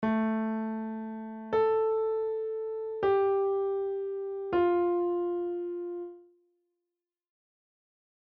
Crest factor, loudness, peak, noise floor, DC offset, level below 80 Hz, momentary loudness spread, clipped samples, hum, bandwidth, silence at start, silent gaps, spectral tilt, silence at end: 12 dB; -30 LUFS; -18 dBFS; -89 dBFS; under 0.1%; -68 dBFS; 11 LU; under 0.1%; none; 4.9 kHz; 0 s; none; -6 dB/octave; 2.15 s